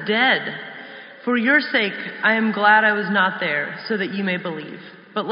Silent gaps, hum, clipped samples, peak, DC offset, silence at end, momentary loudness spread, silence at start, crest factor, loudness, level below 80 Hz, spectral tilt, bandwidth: none; none; under 0.1%; -2 dBFS; under 0.1%; 0 s; 18 LU; 0 s; 18 dB; -19 LUFS; -78 dBFS; -2 dB/octave; 5.4 kHz